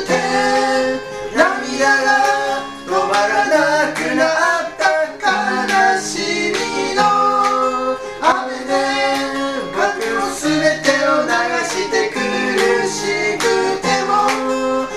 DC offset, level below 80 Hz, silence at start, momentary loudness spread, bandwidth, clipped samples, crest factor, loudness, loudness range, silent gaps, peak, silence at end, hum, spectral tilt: under 0.1%; -48 dBFS; 0 s; 5 LU; 15 kHz; under 0.1%; 16 dB; -16 LUFS; 2 LU; none; 0 dBFS; 0 s; none; -2.5 dB/octave